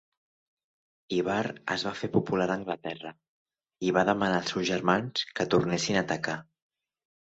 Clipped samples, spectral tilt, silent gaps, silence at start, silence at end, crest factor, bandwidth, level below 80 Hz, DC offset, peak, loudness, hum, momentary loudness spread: under 0.1%; -5 dB/octave; 3.29-3.46 s; 1.1 s; 0.95 s; 22 dB; 8.2 kHz; -64 dBFS; under 0.1%; -8 dBFS; -29 LUFS; none; 9 LU